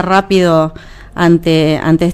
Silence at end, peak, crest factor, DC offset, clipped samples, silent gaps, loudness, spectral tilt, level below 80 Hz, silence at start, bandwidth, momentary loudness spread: 0 s; 0 dBFS; 12 dB; under 0.1%; under 0.1%; none; -11 LUFS; -6.5 dB/octave; -36 dBFS; 0 s; 14.5 kHz; 6 LU